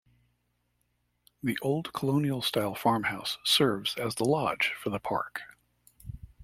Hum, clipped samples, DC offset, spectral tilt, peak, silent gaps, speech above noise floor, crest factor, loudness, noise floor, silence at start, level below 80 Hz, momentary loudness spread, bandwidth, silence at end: 60 Hz at -60 dBFS; under 0.1%; under 0.1%; -4.5 dB/octave; -12 dBFS; none; 46 dB; 20 dB; -29 LUFS; -75 dBFS; 1.45 s; -60 dBFS; 15 LU; 16 kHz; 0 s